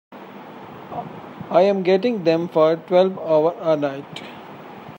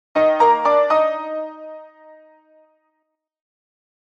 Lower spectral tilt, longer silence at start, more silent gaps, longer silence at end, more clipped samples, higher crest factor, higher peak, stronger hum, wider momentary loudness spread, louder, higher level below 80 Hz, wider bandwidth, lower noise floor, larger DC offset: first, -7.5 dB/octave vs -4.5 dB/octave; about the same, 0.1 s vs 0.15 s; neither; second, 0 s vs 2.15 s; neither; about the same, 18 dB vs 16 dB; about the same, -2 dBFS vs -4 dBFS; neither; about the same, 21 LU vs 22 LU; about the same, -19 LUFS vs -17 LUFS; first, -70 dBFS vs -78 dBFS; first, 16 kHz vs 7.2 kHz; second, -38 dBFS vs -74 dBFS; neither